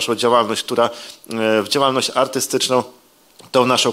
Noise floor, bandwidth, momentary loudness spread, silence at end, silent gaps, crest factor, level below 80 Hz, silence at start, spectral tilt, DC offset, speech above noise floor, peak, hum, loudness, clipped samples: -48 dBFS; 16 kHz; 6 LU; 0 s; none; 16 dB; -66 dBFS; 0 s; -3 dB/octave; under 0.1%; 30 dB; -2 dBFS; none; -17 LUFS; under 0.1%